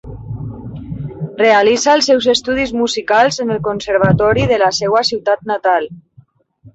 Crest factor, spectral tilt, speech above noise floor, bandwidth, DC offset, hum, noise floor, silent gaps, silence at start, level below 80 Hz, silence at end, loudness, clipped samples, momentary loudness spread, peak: 14 dB; -4.5 dB/octave; 35 dB; 8.2 kHz; under 0.1%; none; -48 dBFS; none; 0.05 s; -40 dBFS; 0.05 s; -13 LUFS; under 0.1%; 16 LU; -2 dBFS